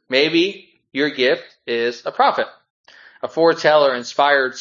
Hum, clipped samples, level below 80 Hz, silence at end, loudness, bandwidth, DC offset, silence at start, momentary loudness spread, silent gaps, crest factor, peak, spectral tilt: none; under 0.1%; -74 dBFS; 0 s; -18 LUFS; 7.6 kHz; under 0.1%; 0.1 s; 11 LU; 2.70-2.84 s; 18 dB; 0 dBFS; -4 dB/octave